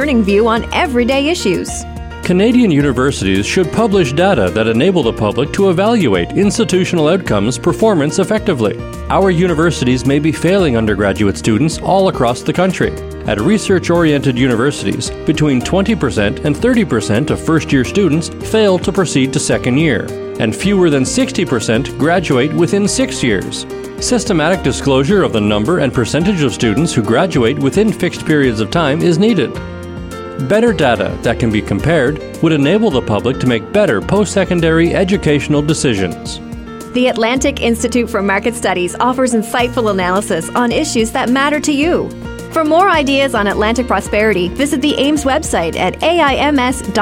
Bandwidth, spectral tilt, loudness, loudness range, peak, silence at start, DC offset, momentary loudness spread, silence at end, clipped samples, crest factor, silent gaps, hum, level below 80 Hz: 16.5 kHz; -5.5 dB/octave; -13 LUFS; 2 LU; -2 dBFS; 0 s; under 0.1%; 5 LU; 0 s; under 0.1%; 12 dB; none; none; -32 dBFS